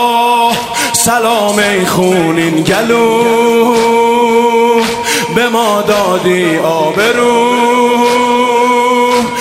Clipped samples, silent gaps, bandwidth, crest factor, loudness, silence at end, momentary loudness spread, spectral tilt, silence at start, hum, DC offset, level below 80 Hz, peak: under 0.1%; none; 16.5 kHz; 10 dB; -10 LUFS; 0 s; 2 LU; -3.5 dB/octave; 0 s; none; under 0.1%; -46 dBFS; 0 dBFS